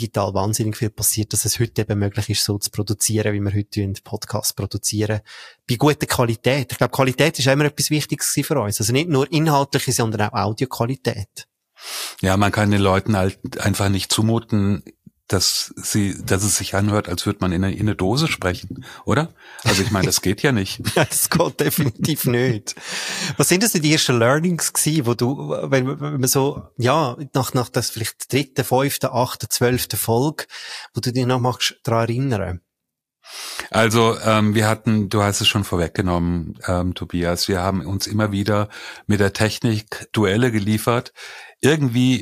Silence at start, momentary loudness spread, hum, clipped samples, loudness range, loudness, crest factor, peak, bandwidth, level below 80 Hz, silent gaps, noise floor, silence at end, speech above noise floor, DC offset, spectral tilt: 0 s; 9 LU; none; under 0.1%; 3 LU; -20 LUFS; 18 dB; -2 dBFS; 15.5 kHz; -48 dBFS; none; -82 dBFS; 0 s; 62 dB; under 0.1%; -4.5 dB/octave